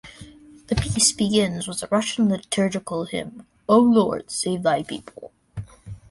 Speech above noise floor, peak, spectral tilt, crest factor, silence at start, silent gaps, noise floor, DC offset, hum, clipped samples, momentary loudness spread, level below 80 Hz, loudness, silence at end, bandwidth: 23 dB; -6 dBFS; -4 dB/octave; 18 dB; 0.05 s; none; -45 dBFS; under 0.1%; none; under 0.1%; 21 LU; -44 dBFS; -21 LUFS; 0.15 s; 11.5 kHz